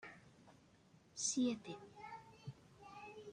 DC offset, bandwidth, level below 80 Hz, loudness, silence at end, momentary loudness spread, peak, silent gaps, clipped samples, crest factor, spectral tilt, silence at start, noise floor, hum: under 0.1%; 10.5 kHz; -80 dBFS; -43 LUFS; 0 s; 22 LU; -26 dBFS; none; under 0.1%; 20 dB; -3 dB/octave; 0 s; -68 dBFS; none